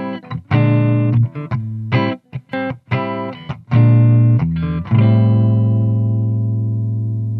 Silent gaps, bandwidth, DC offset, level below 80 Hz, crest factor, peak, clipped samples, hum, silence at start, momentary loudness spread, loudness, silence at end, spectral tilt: none; 4.6 kHz; under 0.1%; -44 dBFS; 14 dB; -2 dBFS; under 0.1%; none; 0 s; 12 LU; -16 LUFS; 0 s; -10.5 dB/octave